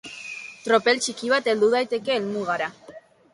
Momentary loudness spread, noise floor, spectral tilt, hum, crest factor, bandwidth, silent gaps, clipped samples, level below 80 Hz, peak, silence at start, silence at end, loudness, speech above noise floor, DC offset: 14 LU; -47 dBFS; -3 dB/octave; none; 18 dB; 11.5 kHz; none; under 0.1%; -70 dBFS; -6 dBFS; 0.05 s; 0.35 s; -23 LUFS; 24 dB; under 0.1%